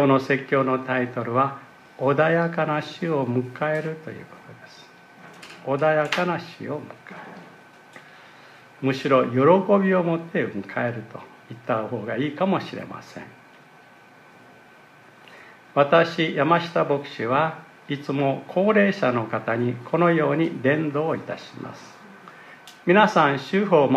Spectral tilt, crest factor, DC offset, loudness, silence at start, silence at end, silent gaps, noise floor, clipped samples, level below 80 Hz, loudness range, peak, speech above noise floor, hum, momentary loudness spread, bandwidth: -7 dB/octave; 20 dB; under 0.1%; -22 LUFS; 0 s; 0 s; none; -50 dBFS; under 0.1%; -72 dBFS; 7 LU; -2 dBFS; 28 dB; none; 22 LU; 13 kHz